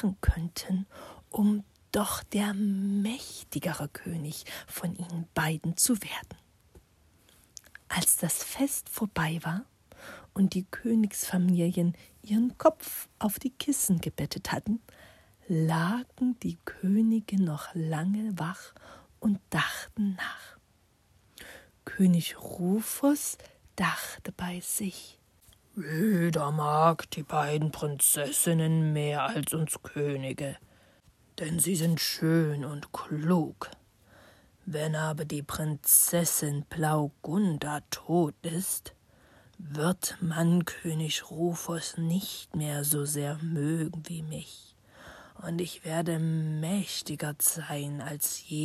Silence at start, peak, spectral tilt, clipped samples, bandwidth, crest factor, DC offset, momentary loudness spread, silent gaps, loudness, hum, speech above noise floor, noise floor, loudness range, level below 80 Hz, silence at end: 0 s; -8 dBFS; -4.5 dB/octave; under 0.1%; 15 kHz; 22 dB; under 0.1%; 13 LU; none; -29 LUFS; none; 37 dB; -66 dBFS; 6 LU; -52 dBFS; 0 s